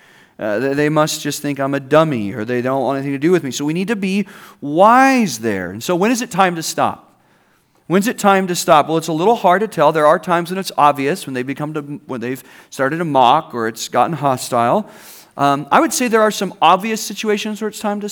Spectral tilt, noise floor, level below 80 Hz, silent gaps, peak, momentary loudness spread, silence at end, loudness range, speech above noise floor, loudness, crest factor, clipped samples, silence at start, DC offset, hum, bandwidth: -4.5 dB/octave; -56 dBFS; -64 dBFS; none; 0 dBFS; 10 LU; 0 s; 3 LU; 40 dB; -16 LUFS; 16 dB; under 0.1%; 0.4 s; under 0.1%; none; over 20 kHz